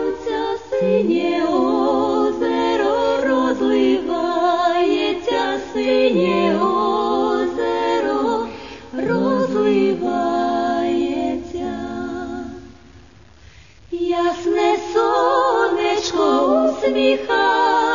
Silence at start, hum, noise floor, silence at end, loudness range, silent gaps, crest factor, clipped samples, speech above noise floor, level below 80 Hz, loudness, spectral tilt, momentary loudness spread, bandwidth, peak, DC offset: 0 s; none; -46 dBFS; 0 s; 6 LU; none; 14 dB; under 0.1%; 30 dB; -50 dBFS; -18 LUFS; -5 dB/octave; 9 LU; 7.4 kHz; -4 dBFS; 0.4%